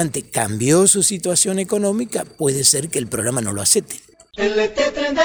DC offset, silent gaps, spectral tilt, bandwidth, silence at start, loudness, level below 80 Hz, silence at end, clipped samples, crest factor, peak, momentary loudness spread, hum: under 0.1%; none; -3 dB/octave; over 20 kHz; 0 s; -17 LUFS; -50 dBFS; 0 s; under 0.1%; 18 dB; 0 dBFS; 9 LU; none